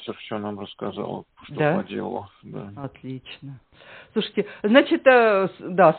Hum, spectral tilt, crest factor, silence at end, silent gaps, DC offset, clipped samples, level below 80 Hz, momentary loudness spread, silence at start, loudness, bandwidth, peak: none; -4 dB/octave; 20 dB; 0 s; none; under 0.1%; under 0.1%; -64 dBFS; 22 LU; 0 s; -22 LUFS; 4.5 kHz; -2 dBFS